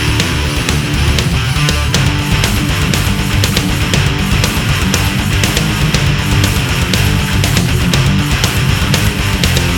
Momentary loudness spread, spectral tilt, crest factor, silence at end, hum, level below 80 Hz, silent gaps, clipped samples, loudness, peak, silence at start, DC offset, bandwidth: 2 LU; -4 dB/octave; 12 dB; 0 s; none; -20 dBFS; none; under 0.1%; -13 LUFS; 0 dBFS; 0 s; under 0.1%; over 20 kHz